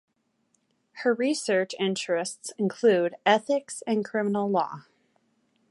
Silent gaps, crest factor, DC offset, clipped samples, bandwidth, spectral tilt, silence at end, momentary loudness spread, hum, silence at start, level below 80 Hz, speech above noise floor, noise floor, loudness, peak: none; 22 dB; under 0.1%; under 0.1%; 11.5 kHz; -4.5 dB/octave; 0.9 s; 8 LU; none; 0.95 s; -80 dBFS; 46 dB; -72 dBFS; -26 LUFS; -6 dBFS